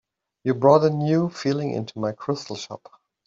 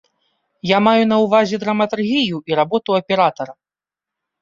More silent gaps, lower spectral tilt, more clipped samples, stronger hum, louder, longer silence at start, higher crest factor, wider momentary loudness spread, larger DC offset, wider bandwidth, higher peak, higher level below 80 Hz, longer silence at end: neither; about the same, -7 dB/octave vs -6 dB/octave; neither; neither; second, -22 LUFS vs -16 LUFS; second, 0.45 s vs 0.65 s; about the same, 20 dB vs 16 dB; first, 17 LU vs 5 LU; neither; about the same, 7.8 kHz vs 7.4 kHz; about the same, -4 dBFS vs -2 dBFS; second, -66 dBFS vs -60 dBFS; second, 0.5 s vs 0.9 s